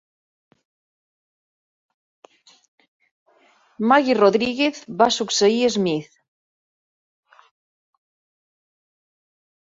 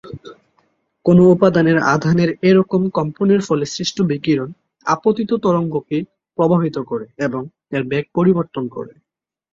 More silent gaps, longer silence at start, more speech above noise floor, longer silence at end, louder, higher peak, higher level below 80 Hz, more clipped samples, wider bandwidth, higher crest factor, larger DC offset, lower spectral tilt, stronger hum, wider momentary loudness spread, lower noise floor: neither; first, 3.8 s vs 0.05 s; second, 40 dB vs 64 dB; first, 3.6 s vs 0.65 s; about the same, -19 LUFS vs -17 LUFS; about the same, -2 dBFS vs -2 dBFS; second, -66 dBFS vs -54 dBFS; neither; about the same, 7.8 kHz vs 7.6 kHz; first, 22 dB vs 16 dB; neither; second, -4 dB/octave vs -7 dB/octave; neither; second, 7 LU vs 14 LU; second, -58 dBFS vs -80 dBFS